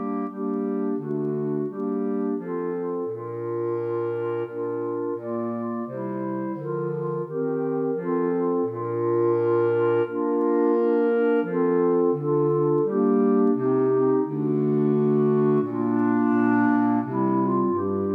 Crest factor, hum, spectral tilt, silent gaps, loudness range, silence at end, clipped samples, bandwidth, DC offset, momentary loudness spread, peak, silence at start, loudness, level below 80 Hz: 12 dB; none; -11.5 dB/octave; none; 7 LU; 0 s; under 0.1%; 3.5 kHz; under 0.1%; 8 LU; -10 dBFS; 0 s; -24 LUFS; -84 dBFS